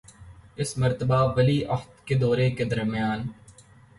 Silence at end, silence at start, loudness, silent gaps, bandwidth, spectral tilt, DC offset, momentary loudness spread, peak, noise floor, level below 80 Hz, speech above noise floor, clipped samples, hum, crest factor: 0.45 s; 0.2 s; -25 LUFS; none; 11.5 kHz; -6.5 dB/octave; under 0.1%; 11 LU; -10 dBFS; -52 dBFS; -50 dBFS; 28 dB; under 0.1%; none; 16 dB